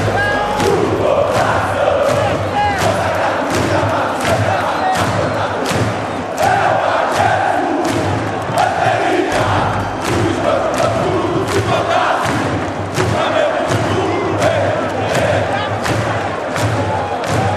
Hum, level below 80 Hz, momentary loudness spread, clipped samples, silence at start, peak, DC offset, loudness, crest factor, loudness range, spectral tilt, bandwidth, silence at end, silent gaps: none; -40 dBFS; 4 LU; under 0.1%; 0 s; 0 dBFS; under 0.1%; -16 LUFS; 16 dB; 1 LU; -5 dB/octave; 14 kHz; 0 s; none